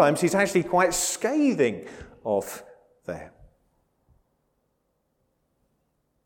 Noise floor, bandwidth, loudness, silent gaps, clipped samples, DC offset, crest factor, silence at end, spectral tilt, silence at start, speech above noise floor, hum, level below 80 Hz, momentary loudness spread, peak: -74 dBFS; 18 kHz; -23 LUFS; none; under 0.1%; under 0.1%; 22 dB; 2.95 s; -4 dB/octave; 0 s; 50 dB; none; -58 dBFS; 18 LU; -6 dBFS